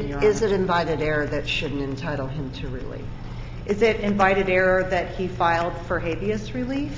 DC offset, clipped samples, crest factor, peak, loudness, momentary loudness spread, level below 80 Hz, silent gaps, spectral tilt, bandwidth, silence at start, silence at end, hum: under 0.1%; under 0.1%; 18 dB; -4 dBFS; -23 LUFS; 14 LU; -38 dBFS; none; -6 dB/octave; 7.8 kHz; 0 s; 0 s; none